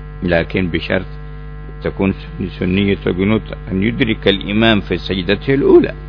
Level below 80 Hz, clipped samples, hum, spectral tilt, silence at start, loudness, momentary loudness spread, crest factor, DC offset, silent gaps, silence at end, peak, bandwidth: -30 dBFS; under 0.1%; none; -8.5 dB/octave; 0 s; -16 LUFS; 13 LU; 16 dB; under 0.1%; none; 0 s; 0 dBFS; 5.4 kHz